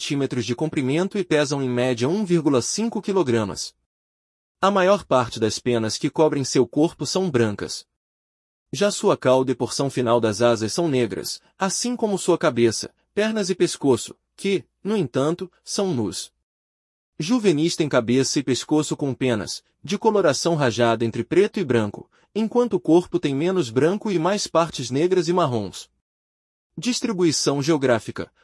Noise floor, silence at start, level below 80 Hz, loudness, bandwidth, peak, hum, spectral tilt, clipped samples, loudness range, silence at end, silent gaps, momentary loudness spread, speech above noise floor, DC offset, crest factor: under -90 dBFS; 0 s; -62 dBFS; -22 LUFS; 12 kHz; -4 dBFS; none; -5 dB/octave; under 0.1%; 3 LU; 0.2 s; 3.86-4.55 s, 7.96-8.66 s, 16.43-17.13 s, 26.01-26.70 s; 10 LU; over 69 dB; under 0.1%; 16 dB